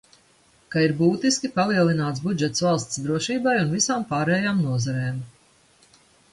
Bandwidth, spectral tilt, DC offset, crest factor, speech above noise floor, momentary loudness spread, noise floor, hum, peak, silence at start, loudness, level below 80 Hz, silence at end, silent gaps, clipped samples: 11.5 kHz; -5 dB/octave; under 0.1%; 18 dB; 36 dB; 6 LU; -59 dBFS; none; -6 dBFS; 0.7 s; -23 LUFS; -60 dBFS; 1.05 s; none; under 0.1%